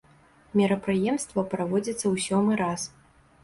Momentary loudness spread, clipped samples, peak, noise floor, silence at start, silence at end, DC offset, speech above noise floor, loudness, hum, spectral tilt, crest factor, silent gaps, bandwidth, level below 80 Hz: 5 LU; under 0.1%; -12 dBFS; -57 dBFS; 0.55 s; 0.55 s; under 0.1%; 32 dB; -26 LUFS; none; -5.5 dB/octave; 14 dB; none; 11.5 kHz; -60 dBFS